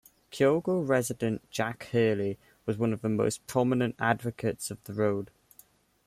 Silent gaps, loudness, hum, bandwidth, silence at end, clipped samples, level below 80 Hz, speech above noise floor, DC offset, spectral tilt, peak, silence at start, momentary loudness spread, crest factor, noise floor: none; -29 LUFS; none; 16 kHz; 0.8 s; under 0.1%; -64 dBFS; 32 dB; under 0.1%; -6 dB/octave; -12 dBFS; 0.3 s; 10 LU; 18 dB; -60 dBFS